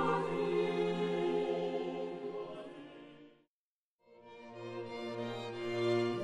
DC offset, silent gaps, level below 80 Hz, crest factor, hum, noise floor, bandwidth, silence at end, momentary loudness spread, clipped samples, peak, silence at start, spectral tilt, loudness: under 0.1%; 3.47-3.99 s; -74 dBFS; 16 dB; none; under -90 dBFS; 10 kHz; 0 s; 18 LU; under 0.1%; -20 dBFS; 0 s; -6.5 dB/octave; -37 LUFS